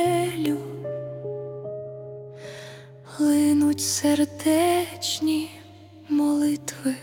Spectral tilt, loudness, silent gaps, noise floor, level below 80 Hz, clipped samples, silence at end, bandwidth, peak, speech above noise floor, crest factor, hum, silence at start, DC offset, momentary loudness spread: -4 dB/octave; -24 LUFS; none; -46 dBFS; -66 dBFS; under 0.1%; 0 s; 18 kHz; -8 dBFS; 23 dB; 16 dB; none; 0 s; under 0.1%; 19 LU